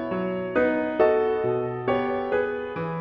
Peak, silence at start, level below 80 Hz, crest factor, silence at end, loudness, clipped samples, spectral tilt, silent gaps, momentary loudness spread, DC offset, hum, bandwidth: -8 dBFS; 0 s; -56 dBFS; 16 dB; 0 s; -25 LUFS; under 0.1%; -9 dB/octave; none; 7 LU; under 0.1%; none; 5.6 kHz